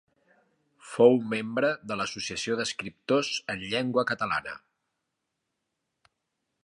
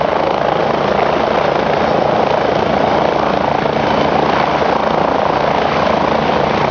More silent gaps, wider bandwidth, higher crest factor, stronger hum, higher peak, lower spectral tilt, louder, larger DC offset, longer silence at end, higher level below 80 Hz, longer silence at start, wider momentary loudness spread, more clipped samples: neither; first, 11 kHz vs 7.2 kHz; first, 24 dB vs 14 dB; neither; second, -6 dBFS vs 0 dBFS; second, -4 dB/octave vs -6 dB/octave; second, -27 LUFS vs -14 LUFS; neither; first, 2.05 s vs 0 s; second, -68 dBFS vs -36 dBFS; first, 0.85 s vs 0 s; first, 12 LU vs 1 LU; neither